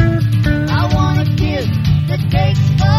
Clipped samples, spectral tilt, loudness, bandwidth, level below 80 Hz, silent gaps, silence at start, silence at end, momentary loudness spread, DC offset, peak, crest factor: under 0.1%; -7.5 dB/octave; -15 LUFS; 13.5 kHz; -26 dBFS; none; 0 s; 0 s; 3 LU; under 0.1%; 0 dBFS; 12 dB